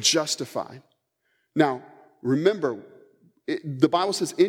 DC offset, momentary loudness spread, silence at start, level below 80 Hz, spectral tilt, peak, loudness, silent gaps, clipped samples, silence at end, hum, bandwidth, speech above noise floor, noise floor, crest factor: under 0.1%; 14 LU; 0 s; -80 dBFS; -4 dB/octave; -4 dBFS; -25 LUFS; none; under 0.1%; 0 s; none; 16.5 kHz; 49 dB; -73 dBFS; 22 dB